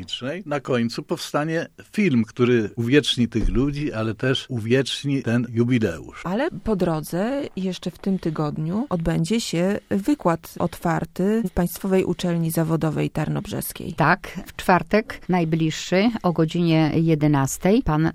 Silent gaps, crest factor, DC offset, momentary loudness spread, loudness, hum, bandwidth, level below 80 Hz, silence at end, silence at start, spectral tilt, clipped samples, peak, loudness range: none; 18 dB; under 0.1%; 8 LU; -22 LUFS; none; 15.5 kHz; -40 dBFS; 0 s; 0 s; -6 dB/octave; under 0.1%; -4 dBFS; 4 LU